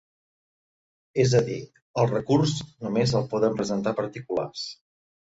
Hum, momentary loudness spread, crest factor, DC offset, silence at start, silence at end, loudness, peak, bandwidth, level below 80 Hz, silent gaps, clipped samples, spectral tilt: none; 11 LU; 18 dB; under 0.1%; 1.15 s; 0.5 s; -26 LUFS; -8 dBFS; 8 kHz; -58 dBFS; 1.82-1.94 s; under 0.1%; -6 dB/octave